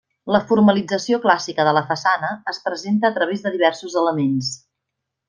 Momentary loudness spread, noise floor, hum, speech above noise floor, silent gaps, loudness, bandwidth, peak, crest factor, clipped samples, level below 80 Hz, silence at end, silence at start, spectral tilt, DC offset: 10 LU; -80 dBFS; none; 61 dB; none; -19 LUFS; 9.6 kHz; -2 dBFS; 18 dB; under 0.1%; -60 dBFS; 0.75 s; 0.25 s; -5 dB/octave; under 0.1%